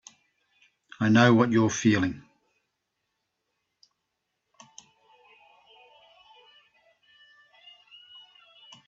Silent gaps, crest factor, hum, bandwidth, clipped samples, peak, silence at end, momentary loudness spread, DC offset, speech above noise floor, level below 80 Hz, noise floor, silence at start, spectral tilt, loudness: none; 26 dB; none; 7.8 kHz; under 0.1%; -4 dBFS; 6.7 s; 29 LU; under 0.1%; 60 dB; -68 dBFS; -81 dBFS; 1 s; -5.5 dB/octave; -22 LUFS